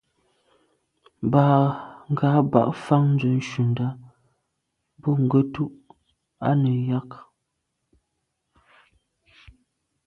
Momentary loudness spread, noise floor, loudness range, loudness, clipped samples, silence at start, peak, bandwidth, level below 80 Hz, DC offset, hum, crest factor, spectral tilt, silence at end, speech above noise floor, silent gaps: 12 LU; -78 dBFS; 7 LU; -22 LUFS; under 0.1%; 1.2 s; -2 dBFS; 6.8 kHz; -60 dBFS; under 0.1%; none; 22 dB; -9 dB/octave; 2.85 s; 57 dB; none